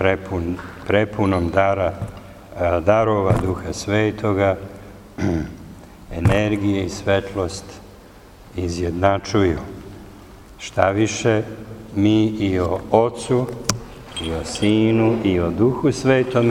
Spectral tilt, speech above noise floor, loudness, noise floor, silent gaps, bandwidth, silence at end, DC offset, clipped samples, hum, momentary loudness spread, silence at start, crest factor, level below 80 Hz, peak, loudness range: -6 dB/octave; 24 dB; -20 LUFS; -43 dBFS; none; 16 kHz; 0 s; under 0.1%; under 0.1%; none; 17 LU; 0 s; 20 dB; -40 dBFS; 0 dBFS; 3 LU